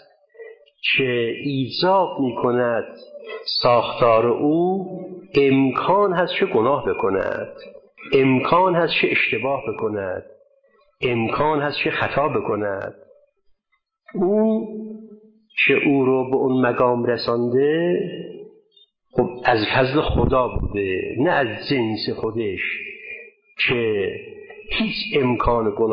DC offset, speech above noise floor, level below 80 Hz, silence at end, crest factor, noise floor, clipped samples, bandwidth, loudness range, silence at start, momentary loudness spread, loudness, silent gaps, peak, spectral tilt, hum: under 0.1%; 52 dB; -42 dBFS; 0 s; 16 dB; -72 dBFS; under 0.1%; 5.6 kHz; 4 LU; 0.4 s; 15 LU; -20 LUFS; none; -4 dBFS; -8.5 dB/octave; none